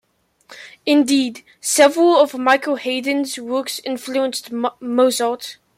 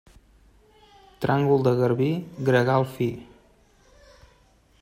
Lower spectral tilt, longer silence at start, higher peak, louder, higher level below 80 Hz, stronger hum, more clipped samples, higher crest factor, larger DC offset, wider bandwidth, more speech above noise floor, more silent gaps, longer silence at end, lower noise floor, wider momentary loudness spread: second, -1.5 dB/octave vs -8 dB/octave; second, 0.5 s vs 1.2 s; first, -2 dBFS vs -6 dBFS; first, -18 LUFS vs -23 LUFS; second, -70 dBFS vs -58 dBFS; neither; neither; about the same, 16 dB vs 18 dB; neither; about the same, 16 kHz vs 16 kHz; second, 33 dB vs 37 dB; neither; second, 0.25 s vs 1.6 s; second, -50 dBFS vs -59 dBFS; first, 12 LU vs 9 LU